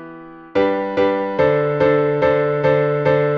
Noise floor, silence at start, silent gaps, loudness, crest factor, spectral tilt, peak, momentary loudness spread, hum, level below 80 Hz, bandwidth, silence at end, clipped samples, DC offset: -37 dBFS; 0 s; none; -17 LUFS; 14 dB; -8.5 dB/octave; -4 dBFS; 3 LU; none; -48 dBFS; 6.2 kHz; 0 s; under 0.1%; under 0.1%